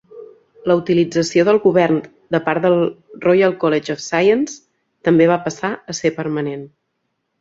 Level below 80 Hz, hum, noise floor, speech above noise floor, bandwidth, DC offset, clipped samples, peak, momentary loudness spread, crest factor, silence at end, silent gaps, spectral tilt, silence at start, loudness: -60 dBFS; none; -72 dBFS; 56 dB; 7.8 kHz; under 0.1%; under 0.1%; -2 dBFS; 10 LU; 16 dB; 0.75 s; none; -6 dB/octave; 0.15 s; -17 LUFS